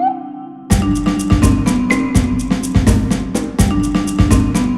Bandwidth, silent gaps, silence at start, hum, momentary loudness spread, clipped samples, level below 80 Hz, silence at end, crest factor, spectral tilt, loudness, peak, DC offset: 15 kHz; none; 0 s; none; 6 LU; under 0.1%; -22 dBFS; 0 s; 14 dB; -6 dB/octave; -15 LUFS; 0 dBFS; 0.5%